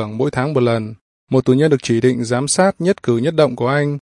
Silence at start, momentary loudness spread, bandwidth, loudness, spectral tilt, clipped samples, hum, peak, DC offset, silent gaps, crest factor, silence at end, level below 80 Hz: 0 s; 5 LU; 11 kHz; -16 LUFS; -5.5 dB/octave; under 0.1%; none; -2 dBFS; under 0.1%; 1.01-1.27 s; 14 dB; 0.05 s; -54 dBFS